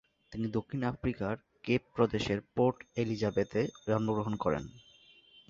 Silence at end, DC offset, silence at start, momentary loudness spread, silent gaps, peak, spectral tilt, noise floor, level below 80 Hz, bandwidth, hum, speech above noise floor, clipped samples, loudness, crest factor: 0.7 s; under 0.1%; 0.3 s; 8 LU; none; -14 dBFS; -7 dB/octave; -61 dBFS; -56 dBFS; 7.6 kHz; none; 29 dB; under 0.1%; -33 LUFS; 20 dB